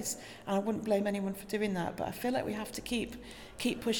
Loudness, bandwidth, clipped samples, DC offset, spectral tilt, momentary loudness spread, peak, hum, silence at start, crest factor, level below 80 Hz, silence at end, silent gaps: -35 LUFS; 19 kHz; under 0.1%; under 0.1%; -4.5 dB/octave; 8 LU; -18 dBFS; none; 0 s; 16 dB; -58 dBFS; 0 s; none